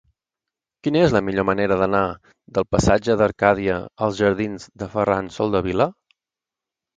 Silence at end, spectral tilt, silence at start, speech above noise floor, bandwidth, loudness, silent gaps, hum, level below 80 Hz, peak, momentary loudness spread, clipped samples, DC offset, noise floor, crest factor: 1.05 s; -6 dB/octave; 0.85 s; 68 dB; 9.4 kHz; -21 LUFS; none; none; -42 dBFS; 0 dBFS; 9 LU; under 0.1%; under 0.1%; -88 dBFS; 20 dB